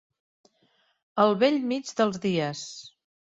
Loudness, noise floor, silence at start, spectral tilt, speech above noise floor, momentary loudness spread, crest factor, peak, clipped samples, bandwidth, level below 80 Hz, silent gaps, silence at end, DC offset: -26 LUFS; -68 dBFS; 1.15 s; -5 dB/octave; 43 dB; 16 LU; 20 dB; -8 dBFS; under 0.1%; 8 kHz; -70 dBFS; none; 0.35 s; under 0.1%